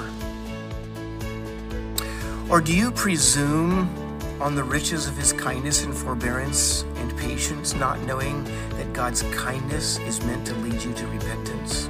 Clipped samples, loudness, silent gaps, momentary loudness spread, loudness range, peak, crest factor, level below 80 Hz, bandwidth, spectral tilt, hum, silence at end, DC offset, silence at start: under 0.1%; -24 LUFS; none; 13 LU; 5 LU; -6 dBFS; 20 dB; -36 dBFS; 16 kHz; -3.5 dB/octave; none; 0 s; under 0.1%; 0 s